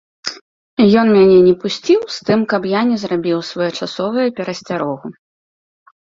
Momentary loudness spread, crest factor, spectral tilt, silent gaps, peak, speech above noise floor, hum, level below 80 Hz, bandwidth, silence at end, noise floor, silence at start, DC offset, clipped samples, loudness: 17 LU; 14 dB; -6 dB/octave; 0.41-0.77 s; -2 dBFS; over 76 dB; none; -54 dBFS; 7.6 kHz; 1 s; under -90 dBFS; 0.25 s; under 0.1%; under 0.1%; -15 LUFS